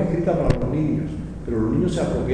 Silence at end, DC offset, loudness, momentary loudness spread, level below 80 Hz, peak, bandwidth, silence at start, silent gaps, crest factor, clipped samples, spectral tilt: 0 s; under 0.1%; -23 LUFS; 7 LU; -32 dBFS; -2 dBFS; 10.5 kHz; 0 s; none; 20 dB; under 0.1%; -8 dB/octave